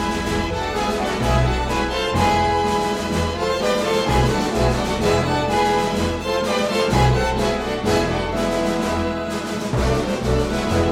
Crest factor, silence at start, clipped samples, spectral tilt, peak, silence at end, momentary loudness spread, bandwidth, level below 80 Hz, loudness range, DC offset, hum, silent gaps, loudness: 14 dB; 0 s; under 0.1%; -5 dB/octave; -6 dBFS; 0 s; 4 LU; 16.5 kHz; -30 dBFS; 2 LU; under 0.1%; none; none; -20 LUFS